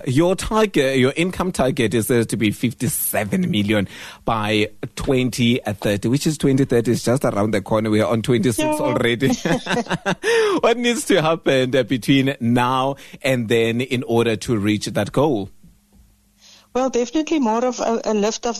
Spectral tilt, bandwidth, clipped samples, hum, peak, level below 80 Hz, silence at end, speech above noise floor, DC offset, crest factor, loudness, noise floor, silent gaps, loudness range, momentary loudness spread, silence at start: -5 dB/octave; 14 kHz; under 0.1%; none; -4 dBFS; -46 dBFS; 0 s; 35 dB; under 0.1%; 14 dB; -19 LUFS; -53 dBFS; none; 4 LU; 4 LU; 0 s